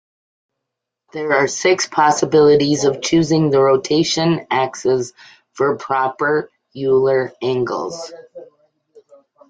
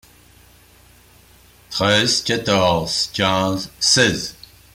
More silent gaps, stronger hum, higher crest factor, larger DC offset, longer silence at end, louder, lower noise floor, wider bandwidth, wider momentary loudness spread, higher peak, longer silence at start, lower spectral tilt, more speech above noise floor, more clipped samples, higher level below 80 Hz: neither; second, none vs 60 Hz at -50 dBFS; about the same, 16 dB vs 18 dB; neither; first, 1.05 s vs 0.4 s; about the same, -16 LUFS vs -17 LUFS; first, -80 dBFS vs -50 dBFS; second, 9.4 kHz vs 16.5 kHz; about the same, 11 LU vs 9 LU; about the same, -2 dBFS vs -2 dBFS; second, 1.15 s vs 1.7 s; first, -4.5 dB/octave vs -3 dB/octave; first, 64 dB vs 31 dB; neither; second, -56 dBFS vs -50 dBFS